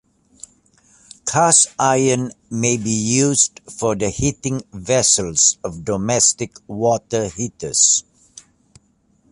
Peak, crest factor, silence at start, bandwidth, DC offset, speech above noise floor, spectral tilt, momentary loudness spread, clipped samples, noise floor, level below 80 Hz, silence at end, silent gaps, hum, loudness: 0 dBFS; 18 dB; 1.25 s; 11.5 kHz; under 0.1%; 41 dB; -3 dB/octave; 13 LU; under 0.1%; -60 dBFS; -48 dBFS; 1.3 s; none; none; -17 LUFS